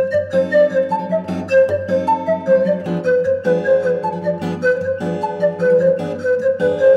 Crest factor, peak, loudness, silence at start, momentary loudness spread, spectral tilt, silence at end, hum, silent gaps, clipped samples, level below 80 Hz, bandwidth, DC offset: 12 dB; -4 dBFS; -17 LUFS; 0 s; 7 LU; -7.5 dB/octave; 0 s; none; none; under 0.1%; -60 dBFS; 8.4 kHz; under 0.1%